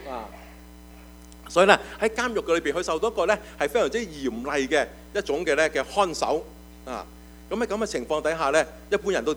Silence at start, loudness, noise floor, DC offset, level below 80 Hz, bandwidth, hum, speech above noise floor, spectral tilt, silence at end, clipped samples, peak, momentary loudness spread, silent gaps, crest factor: 0 s; -25 LUFS; -46 dBFS; under 0.1%; -48 dBFS; over 20 kHz; none; 21 dB; -3.5 dB/octave; 0 s; under 0.1%; 0 dBFS; 15 LU; none; 26 dB